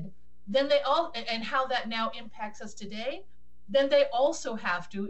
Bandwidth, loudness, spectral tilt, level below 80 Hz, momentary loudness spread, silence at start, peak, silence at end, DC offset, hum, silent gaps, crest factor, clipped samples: 8.4 kHz; -28 LUFS; -3.5 dB/octave; -64 dBFS; 16 LU; 0 s; -12 dBFS; 0 s; 1%; none; none; 18 dB; under 0.1%